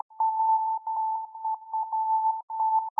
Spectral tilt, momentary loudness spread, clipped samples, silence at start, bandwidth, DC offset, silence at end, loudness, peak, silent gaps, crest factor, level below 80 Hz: 25.5 dB/octave; 7 LU; under 0.1%; 0.15 s; 1.2 kHz; under 0.1%; 0.1 s; -28 LUFS; -16 dBFS; 2.43-2.48 s; 10 dB; under -90 dBFS